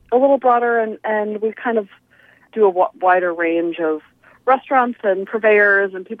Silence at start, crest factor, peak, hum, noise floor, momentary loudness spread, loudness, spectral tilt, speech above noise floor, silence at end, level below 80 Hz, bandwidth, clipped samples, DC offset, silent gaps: 0.1 s; 14 dB; -2 dBFS; none; -50 dBFS; 9 LU; -17 LUFS; -8 dB/octave; 33 dB; 0.05 s; -68 dBFS; 4 kHz; under 0.1%; under 0.1%; none